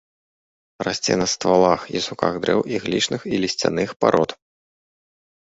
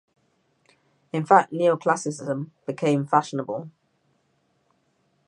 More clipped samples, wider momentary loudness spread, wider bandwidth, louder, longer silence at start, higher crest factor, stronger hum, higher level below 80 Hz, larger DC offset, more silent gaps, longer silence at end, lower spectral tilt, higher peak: neither; second, 7 LU vs 14 LU; second, 8 kHz vs 11 kHz; about the same, -21 LUFS vs -23 LUFS; second, 0.8 s vs 1.15 s; about the same, 20 dB vs 24 dB; neither; first, -54 dBFS vs -78 dBFS; neither; first, 3.96-4.00 s vs none; second, 1.1 s vs 1.6 s; second, -4 dB/octave vs -6 dB/octave; about the same, -2 dBFS vs -2 dBFS